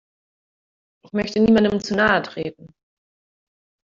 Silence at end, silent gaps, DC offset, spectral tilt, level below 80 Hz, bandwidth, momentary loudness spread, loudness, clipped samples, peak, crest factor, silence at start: 1.3 s; none; under 0.1%; -6 dB/octave; -52 dBFS; 7.4 kHz; 14 LU; -19 LUFS; under 0.1%; -2 dBFS; 20 dB; 1.15 s